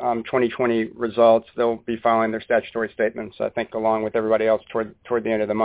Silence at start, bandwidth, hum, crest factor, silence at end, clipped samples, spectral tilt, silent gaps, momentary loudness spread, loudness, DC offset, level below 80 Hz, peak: 0 s; 4 kHz; none; 18 dB; 0 s; under 0.1%; -9.5 dB/octave; none; 9 LU; -22 LUFS; under 0.1%; -58 dBFS; -4 dBFS